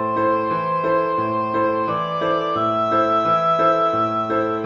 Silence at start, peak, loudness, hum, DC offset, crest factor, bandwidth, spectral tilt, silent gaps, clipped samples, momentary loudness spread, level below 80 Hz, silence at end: 0 s; -6 dBFS; -19 LUFS; none; under 0.1%; 14 dB; 7 kHz; -7 dB/octave; none; under 0.1%; 5 LU; -56 dBFS; 0 s